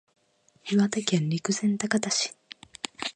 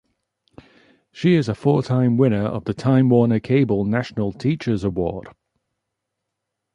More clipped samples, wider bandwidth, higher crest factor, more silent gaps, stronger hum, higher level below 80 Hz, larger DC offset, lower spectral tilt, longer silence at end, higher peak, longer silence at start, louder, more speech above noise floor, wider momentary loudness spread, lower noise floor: neither; about the same, 10 kHz vs 9.8 kHz; about the same, 22 dB vs 18 dB; neither; neither; second, -70 dBFS vs -48 dBFS; neither; second, -4 dB/octave vs -8.5 dB/octave; second, 0.05 s vs 1.45 s; about the same, -6 dBFS vs -4 dBFS; second, 0.65 s vs 1.15 s; second, -27 LUFS vs -20 LUFS; second, 38 dB vs 61 dB; first, 16 LU vs 8 LU; second, -64 dBFS vs -80 dBFS